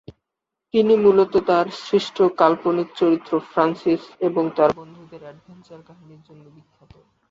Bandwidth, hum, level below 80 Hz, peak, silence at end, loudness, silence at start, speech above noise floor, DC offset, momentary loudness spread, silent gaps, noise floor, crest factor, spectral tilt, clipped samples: 7.6 kHz; none; -60 dBFS; -2 dBFS; 1.55 s; -19 LUFS; 0.75 s; 63 dB; under 0.1%; 8 LU; none; -83 dBFS; 20 dB; -7 dB/octave; under 0.1%